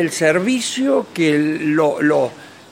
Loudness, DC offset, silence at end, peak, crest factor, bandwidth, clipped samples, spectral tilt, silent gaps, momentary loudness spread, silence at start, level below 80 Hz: -17 LUFS; under 0.1%; 0.2 s; -2 dBFS; 16 dB; 16 kHz; under 0.1%; -4.5 dB/octave; none; 3 LU; 0 s; -64 dBFS